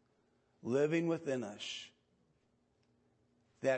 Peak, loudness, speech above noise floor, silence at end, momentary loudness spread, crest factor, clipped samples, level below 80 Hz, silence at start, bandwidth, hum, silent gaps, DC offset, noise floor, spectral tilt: -20 dBFS; -37 LUFS; 40 dB; 0 s; 14 LU; 18 dB; under 0.1%; -86 dBFS; 0.65 s; 8.4 kHz; none; none; under 0.1%; -76 dBFS; -5.5 dB/octave